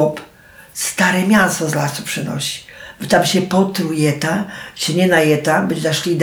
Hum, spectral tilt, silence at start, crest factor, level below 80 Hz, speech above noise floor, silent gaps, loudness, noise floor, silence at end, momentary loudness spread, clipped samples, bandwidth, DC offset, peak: none; -4.5 dB/octave; 0 s; 16 dB; -54 dBFS; 27 dB; none; -16 LUFS; -43 dBFS; 0 s; 12 LU; under 0.1%; over 20 kHz; under 0.1%; -2 dBFS